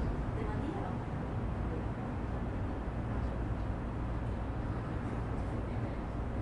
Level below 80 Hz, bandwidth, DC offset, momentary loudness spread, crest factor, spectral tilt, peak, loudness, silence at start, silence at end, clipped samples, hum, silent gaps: -40 dBFS; 10 kHz; under 0.1%; 2 LU; 12 dB; -8.5 dB/octave; -24 dBFS; -38 LUFS; 0 s; 0 s; under 0.1%; none; none